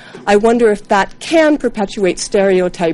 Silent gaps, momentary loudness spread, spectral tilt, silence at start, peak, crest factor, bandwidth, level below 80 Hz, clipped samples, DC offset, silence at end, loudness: none; 5 LU; -4.5 dB/octave; 0.05 s; 0 dBFS; 14 dB; 11.5 kHz; -40 dBFS; under 0.1%; under 0.1%; 0 s; -13 LUFS